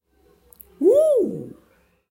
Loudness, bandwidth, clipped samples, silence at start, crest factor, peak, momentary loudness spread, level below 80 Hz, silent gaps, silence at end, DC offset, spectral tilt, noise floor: -19 LUFS; 16.5 kHz; under 0.1%; 0.8 s; 16 dB; -6 dBFS; 20 LU; -62 dBFS; none; 0.6 s; under 0.1%; -7.5 dB/octave; -60 dBFS